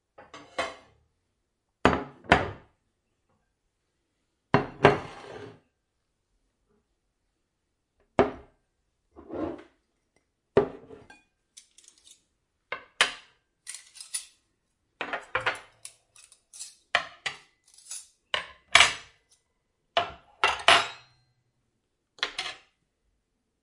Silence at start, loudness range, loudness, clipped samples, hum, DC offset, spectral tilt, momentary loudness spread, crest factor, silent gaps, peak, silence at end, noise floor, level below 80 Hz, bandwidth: 0.2 s; 10 LU; -27 LUFS; under 0.1%; none; under 0.1%; -3 dB/octave; 24 LU; 30 dB; none; -2 dBFS; 1.1 s; -79 dBFS; -56 dBFS; 11.5 kHz